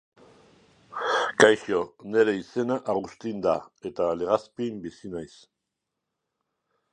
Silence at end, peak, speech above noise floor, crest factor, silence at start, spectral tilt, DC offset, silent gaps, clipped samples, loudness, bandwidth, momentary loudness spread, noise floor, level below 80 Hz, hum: 1.65 s; -2 dBFS; 58 dB; 26 dB; 0.9 s; -4 dB/octave; under 0.1%; none; under 0.1%; -25 LUFS; 9.6 kHz; 19 LU; -83 dBFS; -64 dBFS; none